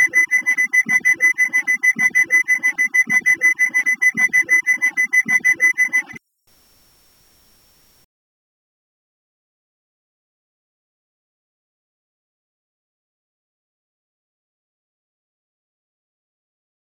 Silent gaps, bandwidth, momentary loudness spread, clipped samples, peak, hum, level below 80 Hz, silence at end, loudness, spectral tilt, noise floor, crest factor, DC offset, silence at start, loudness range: none; 19 kHz; 3 LU; under 0.1%; -4 dBFS; none; -72 dBFS; 10.7 s; -14 LUFS; -1 dB/octave; -58 dBFS; 16 dB; under 0.1%; 0 s; 6 LU